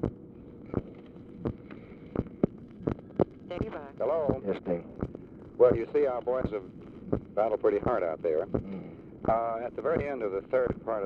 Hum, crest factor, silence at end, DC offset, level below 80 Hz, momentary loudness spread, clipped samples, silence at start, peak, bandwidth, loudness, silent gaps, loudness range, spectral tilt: none; 20 dB; 0 s; under 0.1%; -50 dBFS; 19 LU; under 0.1%; 0 s; -10 dBFS; 5.2 kHz; -31 LUFS; none; 7 LU; -10 dB/octave